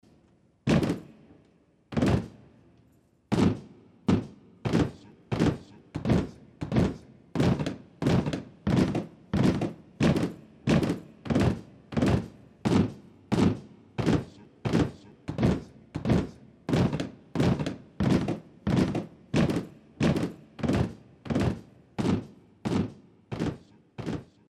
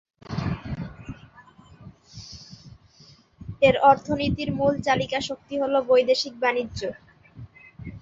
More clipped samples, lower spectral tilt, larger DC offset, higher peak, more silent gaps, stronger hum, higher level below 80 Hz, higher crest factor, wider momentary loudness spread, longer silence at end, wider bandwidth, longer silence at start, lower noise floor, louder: neither; first, -7.5 dB/octave vs -5.5 dB/octave; neither; second, -10 dBFS vs -4 dBFS; neither; neither; about the same, -46 dBFS vs -48 dBFS; about the same, 18 dB vs 22 dB; second, 14 LU vs 25 LU; first, 0.25 s vs 0.05 s; first, 13 kHz vs 7.8 kHz; first, 0.65 s vs 0.3 s; first, -63 dBFS vs -54 dBFS; second, -29 LUFS vs -23 LUFS